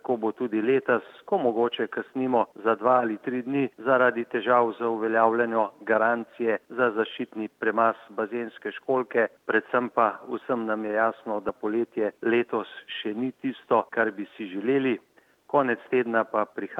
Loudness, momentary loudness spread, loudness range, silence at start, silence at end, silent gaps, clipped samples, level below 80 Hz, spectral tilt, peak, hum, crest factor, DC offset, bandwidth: -26 LUFS; 9 LU; 4 LU; 0.05 s; 0 s; none; under 0.1%; -78 dBFS; -7.5 dB/octave; -6 dBFS; none; 20 dB; under 0.1%; 4.9 kHz